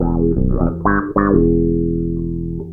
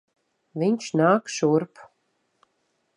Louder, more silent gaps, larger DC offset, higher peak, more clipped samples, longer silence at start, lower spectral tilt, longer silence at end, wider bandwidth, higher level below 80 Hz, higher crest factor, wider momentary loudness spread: first, -17 LUFS vs -23 LUFS; neither; neither; first, 0 dBFS vs -6 dBFS; neither; second, 0 s vs 0.55 s; first, -13.5 dB/octave vs -6 dB/octave; second, 0 s vs 1.15 s; second, 2.4 kHz vs 11 kHz; first, -24 dBFS vs -76 dBFS; about the same, 16 dB vs 20 dB; second, 8 LU vs 14 LU